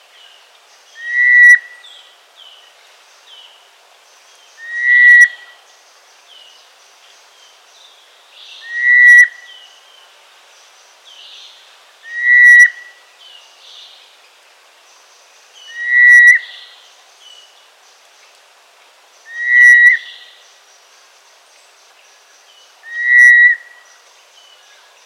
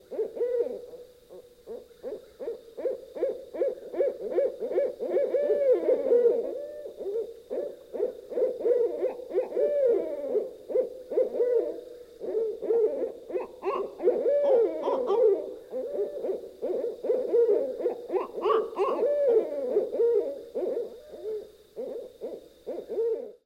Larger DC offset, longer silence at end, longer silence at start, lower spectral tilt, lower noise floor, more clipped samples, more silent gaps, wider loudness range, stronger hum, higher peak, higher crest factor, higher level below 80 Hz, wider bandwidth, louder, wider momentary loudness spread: neither; first, 1.5 s vs 0.15 s; first, 1 s vs 0.1 s; second, 7 dB/octave vs -6 dB/octave; about the same, -47 dBFS vs -50 dBFS; neither; neither; about the same, 4 LU vs 6 LU; neither; first, 0 dBFS vs -12 dBFS; about the same, 14 dB vs 16 dB; second, under -90 dBFS vs -70 dBFS; first, 18.5 kHz vs 8.6 kHz; first, -6 LUFS vs -28 LUFS; first, 21 LU vs 16 LU